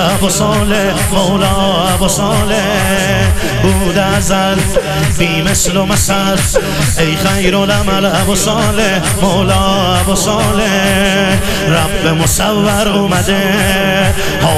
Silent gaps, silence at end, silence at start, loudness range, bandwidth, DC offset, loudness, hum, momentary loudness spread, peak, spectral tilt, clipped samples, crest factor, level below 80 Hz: none; 0 s; 0 s; 1 LU; 15.5 kHz; under 0.1%; -11 LUFS; none; 2 LU; 0 dBFS; -4 dB/octave; under 0.1%; 12 dB; -24 dBFS